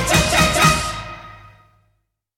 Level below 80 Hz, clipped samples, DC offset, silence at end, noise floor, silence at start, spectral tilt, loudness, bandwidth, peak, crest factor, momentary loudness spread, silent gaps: -32 dBFS; under 0.1%; under 0.1%; 1 s; -68 dBFS; 0 s; -3 dB/octave; -15 LUFS; 17 kHz; -2 dBFS; 18 dB; 20 LU; none